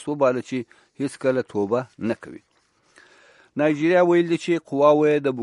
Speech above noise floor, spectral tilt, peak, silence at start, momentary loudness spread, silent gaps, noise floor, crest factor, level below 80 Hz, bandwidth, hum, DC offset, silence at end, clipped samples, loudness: 41 dB; -6.5 dB/octave; -4 dBFS; 0 s; 14 LU; none; -62 dBFS; 18 dB; -70 dBFS; 11 kHz; none; under 0.1%; 0 s; under 0.1%; -22 LUFS